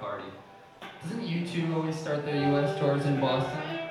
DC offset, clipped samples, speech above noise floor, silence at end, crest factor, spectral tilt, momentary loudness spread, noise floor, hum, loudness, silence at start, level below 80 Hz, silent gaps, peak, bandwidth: under 0.1%; under 0.1%; 22 dB; 0 s; 16 dB; -7 dB/octave; 17 LU; -50 dBFS; none; -29 LUFS; 0 s; -66 dBFS; none; -14 dBFS; 12 kHz